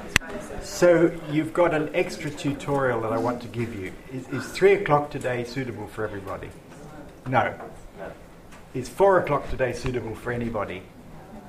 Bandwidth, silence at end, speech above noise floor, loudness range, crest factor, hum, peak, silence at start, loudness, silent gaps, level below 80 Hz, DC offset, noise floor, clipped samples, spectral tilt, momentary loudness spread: 15.5 kHz; 0 s; 21 dB; 7 LU; 26 dB; none; 0 dBFS; 0 s; -25 LUFS; none; -46 dBFS; under 0.1%; -45 dBFS; under 0.1%; -5.5 dB/octave; 20 LU